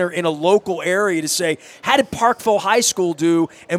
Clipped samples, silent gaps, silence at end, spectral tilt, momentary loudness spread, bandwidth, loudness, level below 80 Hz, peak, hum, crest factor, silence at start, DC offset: under 0.1%; none; 0 s; -3.5 dB/octave; 4 LU; 16 kHz; -18 LUFS; -56 dBFS; 0 dBFS; none; 18 dB; 0 s; under 0.1%